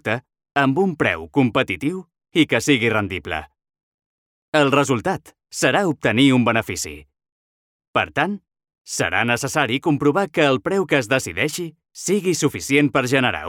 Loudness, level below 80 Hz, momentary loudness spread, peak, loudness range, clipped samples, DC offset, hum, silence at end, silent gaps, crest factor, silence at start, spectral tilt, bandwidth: -20 LUFS; -56 dBFS; 11 LU; -2 dBFS; 3 LU; under 0.1%; under 0.1%; none; 0 s; 3.83-3.98 s, 4.06-4.52 s, 7.32-7.79 s, 7.87-7.93 s, 8.78-8.85 s; 18 dB; 0.05 s; -4.5 dB/octave; 17 kHz